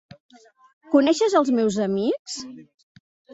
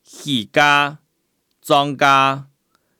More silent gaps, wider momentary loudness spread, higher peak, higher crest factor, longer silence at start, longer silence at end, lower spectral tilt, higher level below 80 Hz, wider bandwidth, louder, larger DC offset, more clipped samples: first, 2.19-2.25 s vs none; first, 15 LU vs 9 LU; about the same, -4 dBFS vs -2 dBFS; about the same, 18 dB vs 18 dB; first, 0.9 s vs 0.15 s; first, 0.7 s vs 0.55 s; about the same, -5 dB/octave vs -4 dB/octave; about the same, -68 dBFS vs -66 dBFS; second, 8.2 kHz vs 19 kHz; second, -21 LUFS vs -16 LUFS; neither; neither